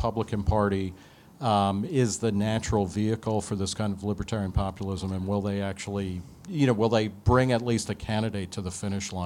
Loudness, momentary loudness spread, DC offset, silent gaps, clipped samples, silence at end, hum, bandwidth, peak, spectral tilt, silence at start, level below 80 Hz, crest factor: -28 LUFS; 9 LU; under 0.1%; none; under 0.1%; 0 s; none; 13.5 kHz; -8 dBFS; -6 dB/octave; 0 s; -44 dBFS; 18 dB